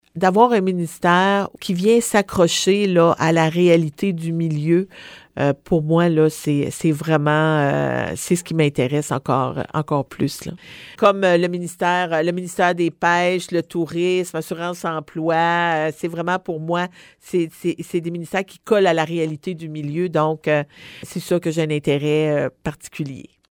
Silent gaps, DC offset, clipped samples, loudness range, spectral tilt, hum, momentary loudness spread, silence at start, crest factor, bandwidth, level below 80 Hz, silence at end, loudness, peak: none; under 0.1%; under 0.1%; 5 LU; -5.5 dB/octave; none; 11 LU; 0.15 s; 18 dB; 19.5 kHz; -54 dBFS; 0.3 s; -19 LUFS; 0 dBFS